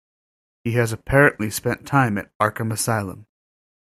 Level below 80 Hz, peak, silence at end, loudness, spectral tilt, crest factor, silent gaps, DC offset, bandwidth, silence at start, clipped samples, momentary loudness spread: -46 dBFS; -2 dBFS; 0.7 s; -21 LUFS; -5.5 dB/octave; 20 dB; 2.35-2.40 s; under 0.1%; 16 kHz; 0.65 s; under 0.1%; 9 LU